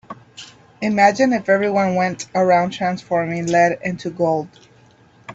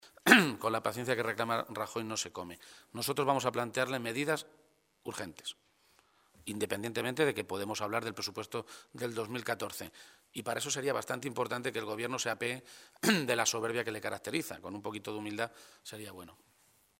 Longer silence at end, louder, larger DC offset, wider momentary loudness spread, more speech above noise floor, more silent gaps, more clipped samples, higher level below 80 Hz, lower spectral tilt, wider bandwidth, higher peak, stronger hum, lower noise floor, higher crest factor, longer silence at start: second, 0 s vs 0.65 s; first, -18 LUFS vs -34 LUFS; neither; about the same, 18 LU vs 16 LU; about the same, 33 dB vs 33 dB; neither; neither; first, -60 dBFS vs -76 dBFS; first, -5.5 dB/octave vs -3.5 dB/octave; second, 8.2 kHz vs 16 kHz; about the same, -2 dBFS vs -4 dBFS; neither; second, -51 dBFS vs -69 dBFS; second, 18 dB vs 32 dB; about the same, 0.1 s vs 0.05 s